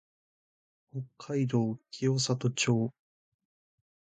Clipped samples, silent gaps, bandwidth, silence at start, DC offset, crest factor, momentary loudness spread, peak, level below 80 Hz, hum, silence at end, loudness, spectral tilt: under 0.1%; none; 9.4 kHz; 0.95 s; under 0.1%; 18 dB; 14 LU; -14 dBFS; -70 dBFS; none; 1.25 s; -30 LUFS; -5 dB/octave